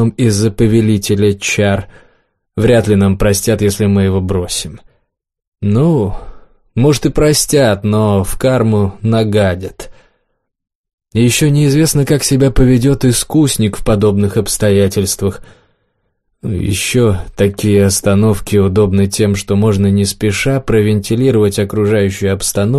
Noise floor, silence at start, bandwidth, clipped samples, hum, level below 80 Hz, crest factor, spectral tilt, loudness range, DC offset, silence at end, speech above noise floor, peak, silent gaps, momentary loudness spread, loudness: -66 dBFS; 0 s; 13 kHz; under 0.1%; none; -30 dBFS; 12 dB; -5.5 dB/octave; 4 LU; 0.3%; 0 s; 55 dB; 0 dBFS; 5.47-5.52 s, 10.75-10.84 s, 10.93-10.98 s; 6 LU; -12 LUFS